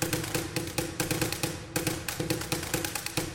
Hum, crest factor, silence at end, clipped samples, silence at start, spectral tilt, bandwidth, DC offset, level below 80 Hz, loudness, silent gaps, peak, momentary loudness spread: none; 20 dB; 0 s; under 0.1%; 0 s; -3.5 dB/octave; 17 kHz; under 0.1%; -50 dBFS; -31 LUFS; none; -12 dBFS; 3 LU